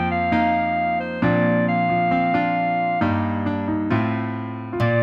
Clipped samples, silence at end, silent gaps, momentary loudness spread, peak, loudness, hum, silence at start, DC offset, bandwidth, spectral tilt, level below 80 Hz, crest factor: under 0.1%; 0 s; none; 5 LU; -8 dBFS; -21 LUFS; none; 0 s; under 0.1%; 6 kHz; -9 dB/octave; -48 dBFS; 14 dB